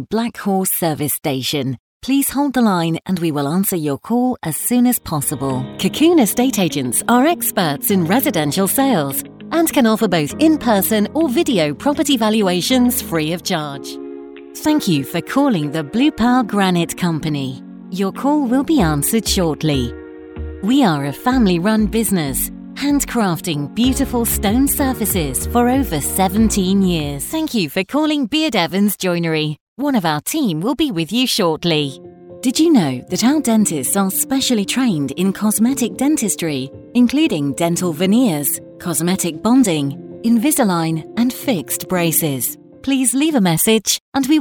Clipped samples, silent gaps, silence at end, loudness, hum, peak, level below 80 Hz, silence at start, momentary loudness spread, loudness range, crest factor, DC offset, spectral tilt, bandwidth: under 0.1%; 1.79-2.00 s, 29.61-29.76 s, 44.00-44.12 s; 0 s; -17 LUFS; none; -2 dBFS; -38 dBFS; 0 s; 7 LU; 2 LU; 16 dB; under 0.1%; -4.5 dB/octave; 19.5 kHz